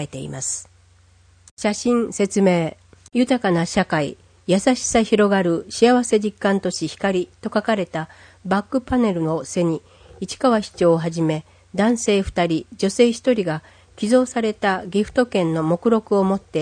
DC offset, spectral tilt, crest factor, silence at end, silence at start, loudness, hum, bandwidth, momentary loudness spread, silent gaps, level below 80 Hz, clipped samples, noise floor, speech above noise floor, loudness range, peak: under 0.1%; -5 dB/octave; 18 dB; 0 s; 0 s; -20 LUFS; none; 9.8 kHz; 10 LU; 1.51-1.57 s; -48 dBFS; under 0.1%; -53 dBFS; 34 dB; 4 LU; -2 dBFS